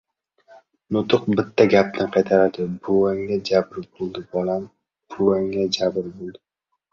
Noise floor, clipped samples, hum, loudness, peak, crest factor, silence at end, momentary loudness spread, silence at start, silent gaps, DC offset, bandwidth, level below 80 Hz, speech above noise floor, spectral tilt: -55 dBFS; under 0.1%; none; -21 LUFS; -2 dBFS; 20 dB; 0.6 s; 15 LU; 0.9 s; none; under 0.1%; 7.4 kHz; -56 dBFS; 35 dB; -6 dB/octave